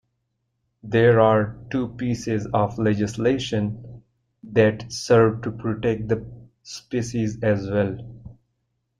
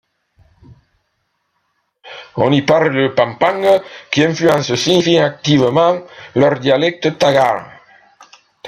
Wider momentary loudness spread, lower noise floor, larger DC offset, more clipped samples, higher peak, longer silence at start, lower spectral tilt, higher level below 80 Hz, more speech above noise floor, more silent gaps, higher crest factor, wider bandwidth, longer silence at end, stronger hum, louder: first, 12 LU vs 8 LU; first, -75 dBFS vs -68 dBFS; neither; neither; second, -4 dBFS vs 0 dBFS; second, 0.85 s vs 2.05 s; about the same, -6.5 dB/octave vs -5.5 dB/octave; about the same, -52 dBFS vs -54 dBFS; about the same, 53 dB vs 54 dB; neither; about the same, 20 dB vs 16 dB; second, 11 kHz vs 15.5 kHz; first, 0.65 s vs 0 s; neither; second, -22 LUFS vs -14 LUFS